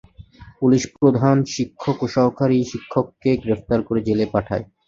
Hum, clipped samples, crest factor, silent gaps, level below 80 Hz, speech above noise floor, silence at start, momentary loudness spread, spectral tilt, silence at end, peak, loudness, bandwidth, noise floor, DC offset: none; under 0.1%; 18 dB; none; -48 dBFS; 25 dB; 0.4 s; 7 LU; -7 dB/octave; 0.25 s; -2 dBFS; -20 LUFS; 7.8 kHz; -44 dBFS; under 0.1%